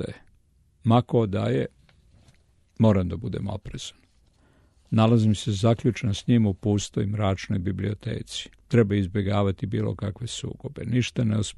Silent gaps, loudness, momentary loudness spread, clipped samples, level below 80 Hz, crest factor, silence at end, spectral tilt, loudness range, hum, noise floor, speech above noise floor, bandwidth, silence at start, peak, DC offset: none; -25 LUFS; 13 LU; under 0.1%; -50 dBFS; 18 dB; 0.05 s; -7 dB/octave; 4 LU; none; -61 dBFS; 37 dB; 11.5 kHz; 0 s; -8 dBFS; under 0.1%